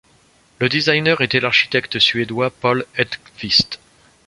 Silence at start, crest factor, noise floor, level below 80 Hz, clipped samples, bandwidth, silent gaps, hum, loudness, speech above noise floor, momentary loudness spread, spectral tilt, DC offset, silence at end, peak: 0.6 s; 18 dB; -54 dBFS; -54 dBFS; under 0.1%; 11.5 kHz; none; none; -17 LUFS; 36 dB; 8 LU; -4.5 dB/octave; under 0.1%; 0.5 s; 0 dBFS